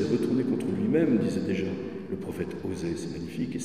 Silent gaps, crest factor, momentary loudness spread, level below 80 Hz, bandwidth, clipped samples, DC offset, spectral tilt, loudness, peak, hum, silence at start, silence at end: none; 16 dB; 11 LU; -60 dBFS; 14.5 kHz; under 0.1%; 0.2%; -7 dB/octave; -29 LUFS; -12 dBFS; none; 0 s; 0 s